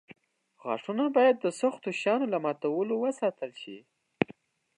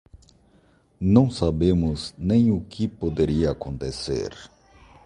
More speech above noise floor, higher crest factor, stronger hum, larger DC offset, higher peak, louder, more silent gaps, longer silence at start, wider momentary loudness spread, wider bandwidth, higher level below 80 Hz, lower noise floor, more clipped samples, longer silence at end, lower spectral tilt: second, 27 dB vs 37 dB; about the same, 22 dB vs 22 dB; neither; neither; second, -8 dBFS vs -2 dBFS; second, -29 LUFS vs -23 LUFS; neither; first, 0.65 s vs 0.15 s; first, 17 LU vs 11 LU; about the same, 11 kHz vs 11 kHz; second, -74 dBFS vs -38 dBFS; second, -55 dBFS vs -59 dBFS; neither; about the same, 0.55 s vs 0.6 s; second, -5.5 dB/octave vs -7.5 dB/octave